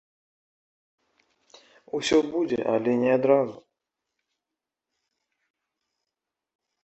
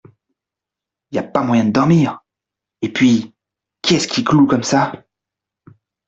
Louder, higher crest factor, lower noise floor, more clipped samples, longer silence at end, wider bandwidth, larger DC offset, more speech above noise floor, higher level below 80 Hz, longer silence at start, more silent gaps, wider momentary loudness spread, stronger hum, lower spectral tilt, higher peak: second, -24 LUFS vs -16 LUFS; first, 22 dB vs 16 dB; about the same, -87 dBFS vs -85 dBFS; neither; first, 3.3 s vs 1.1 s; about the same, 8.4 kHz vs 8.2 kHz; neither; second, 64 dB vs 71 dB; second, -66 dBFS vs -54 dBFS; first, 1.95 s vs 1.1 s; neither; second, 9 LU vs 13 LU; neither; about the same, -5 dB/octave vs -5.5 dB/octave; second, -6 dBFS vs -2 dBFS